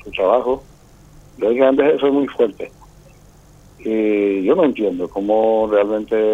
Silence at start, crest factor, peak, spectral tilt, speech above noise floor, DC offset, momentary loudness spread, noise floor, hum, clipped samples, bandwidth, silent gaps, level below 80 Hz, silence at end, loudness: 0.05 s; 16 dB; -2 dBFS; -7 dB/octave; 30 dB; under 0.1%; 8 LU; -46 dBFS; 50 Hz at -50 dBFS; under 0.1%; 8.2 kHz; none; -50 dBFS; 0 s; -17 LUFS